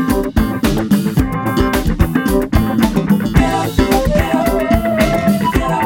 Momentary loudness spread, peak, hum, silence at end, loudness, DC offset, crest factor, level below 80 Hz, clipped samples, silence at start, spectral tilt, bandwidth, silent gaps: 2 LU; 0 dBFS; none; 0 s; -15 LUFS; under 0.1%; 14 dB; -22 dBFS; under 0.1%; 0 s; -6.5 dB/octave; 17.5 kHz; none